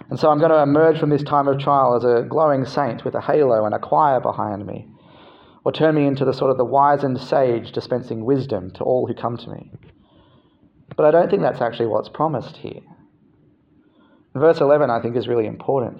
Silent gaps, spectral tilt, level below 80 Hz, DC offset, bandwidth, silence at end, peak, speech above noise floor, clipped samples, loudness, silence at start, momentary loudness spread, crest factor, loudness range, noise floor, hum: none; -8.5 dB/octave; -62 dBFS; under 0.1%; 7.2 kHz; 0 s; -2 dBFS; 38 dB; under 0.1%; -19 LUFS; 0.1 s; 12 LU; 18 dB; 6 LU; -56 dBFS; none